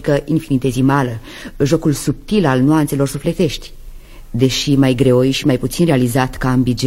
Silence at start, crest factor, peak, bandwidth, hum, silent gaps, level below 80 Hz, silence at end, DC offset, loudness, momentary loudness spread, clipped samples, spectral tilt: 0 s; 14 dB; 0 dBFS; 16.5 kHz; none; none; -34 dBFS; 0 s; under 0.1%; -15 LUFS; 7 LU; under 0.1%; -6 dB/octave